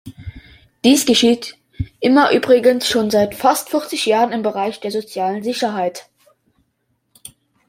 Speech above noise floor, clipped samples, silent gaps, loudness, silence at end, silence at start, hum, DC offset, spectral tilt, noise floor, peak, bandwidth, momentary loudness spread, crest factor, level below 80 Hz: 52 dB; under 0.1%; none; -16 LUFS; 1.65 s; 0.05 s; none; under 0.1%; -3.5 dB/octave; -68 dBFS; -2 dBFS; 16.5 kHz; 17 LU; 16 dB; -48 dBFS